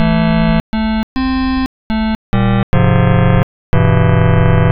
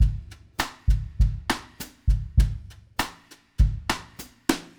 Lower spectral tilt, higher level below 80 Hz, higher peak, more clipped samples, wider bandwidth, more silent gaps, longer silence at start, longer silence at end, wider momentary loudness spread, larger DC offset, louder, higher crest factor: first, -9.5 dB/octave vs -5 dB/octave; about the same, -22 dBFS vs -26 dBFS; first, 0 dBFS vs -4 dBFS; neither; second, 5.2 kHz vs over 20 kHz; first, 0.60-0.73 s, 1.03-1.16 s, 1.66-1.90 s, 2.15-2.33 s, 2.63-2.73 s, 3.43-3.73 s vs none; about the same, 0 s vs 0 s; second, 0 s vs 0.15 s; second, 6 LU vs 13 LU; neither; first, -14 LUFS vs -28 LUFS; second, 12 dB vs 20 dB